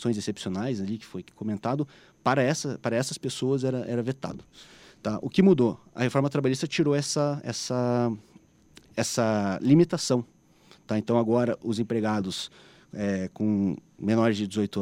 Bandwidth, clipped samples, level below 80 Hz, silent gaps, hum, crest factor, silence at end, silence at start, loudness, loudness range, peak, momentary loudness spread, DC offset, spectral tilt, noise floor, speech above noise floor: 16 kHz; under 0.1%; -64 dBFS; none; none; 20 dB; 0 s; 0 s; -27 LUFS; 3 LU; -8 dBFS; 12 LU; under 0.1%; -6 dB/octave; -57 dBFS; 31 dB